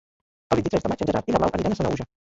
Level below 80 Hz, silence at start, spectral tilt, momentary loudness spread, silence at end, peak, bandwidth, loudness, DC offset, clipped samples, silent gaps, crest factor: -44 dBFS; 0.5 s; -7 dB/octave; 4 LU; 0.2 s; -4 dBFS; 8 kHz; -24 LUFS; under 0.1%; under 0.1%; none; 20 dB